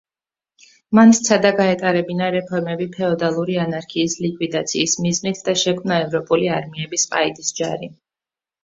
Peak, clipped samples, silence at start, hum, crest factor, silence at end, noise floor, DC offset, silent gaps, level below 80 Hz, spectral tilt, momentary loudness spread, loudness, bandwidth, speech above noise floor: -2 dBFS; under 0.1%; 0.9 s; none; 18 dB; 0.7 s; under -90 dBFS; under 0.1%; none; -60 dBFS; -4 dB/octave; 10 LU; -18 LUFS; 7.8 kHz; over 72 dB